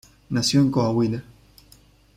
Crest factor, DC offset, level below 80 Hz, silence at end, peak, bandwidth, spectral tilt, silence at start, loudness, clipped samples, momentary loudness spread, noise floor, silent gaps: 16 dB; under 0.1%; -54 dBFS; 0.95 s; -8 dBFS; 15.5 kHz; -5.5 dB/octave; 0.3 s; -22 LUFS; under 0.1%; 9 LU; -54 dBFS; none